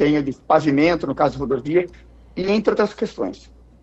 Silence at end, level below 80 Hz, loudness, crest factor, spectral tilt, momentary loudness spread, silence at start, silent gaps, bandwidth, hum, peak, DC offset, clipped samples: 0.45 s; -46 dBFS; -20 LUFS; 16 dB; -7 dB/octave; 11 LU; 0 s; none; 8 kHz; none; -4 dBFS; under 0.1%; under 0.1%